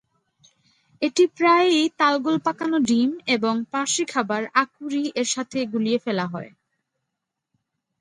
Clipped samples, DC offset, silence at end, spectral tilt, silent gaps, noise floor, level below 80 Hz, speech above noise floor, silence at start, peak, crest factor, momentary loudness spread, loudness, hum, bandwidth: under 0.1%; under 0.1%; 1.55 s; -3.5 dB/octave; none; -82 dBFS; -70 dBFS; 60 dB; 1 s; -6 dBFS; 18 dB; 9 LU; -22 LUFS; none; 11.5 kHz